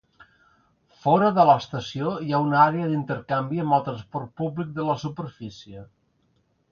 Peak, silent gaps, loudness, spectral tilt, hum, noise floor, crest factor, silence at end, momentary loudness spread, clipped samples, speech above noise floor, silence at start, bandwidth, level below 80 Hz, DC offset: -4 dBFS; none; -23 LUFS; -7.5 dB/octave; none; -67 dBFS; 20 dB; 0.85 s; 18 LU; under 0.1%; 44 dB; 1.05 s; 7.2 kHz; -62 dBFS; under 0.1%